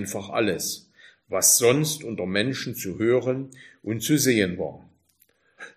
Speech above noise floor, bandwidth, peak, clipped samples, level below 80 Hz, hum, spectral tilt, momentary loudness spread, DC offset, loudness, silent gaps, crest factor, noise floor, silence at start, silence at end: 41 dB; 15.5 kHz; -6 dBFS; under 0.1%; -64 dBFS; none; -3.5 dB/octave; 15 LU; under 0.1%; -23 LUFS; none; 20 dB; -65 dBFS; 0 s; 0.05 s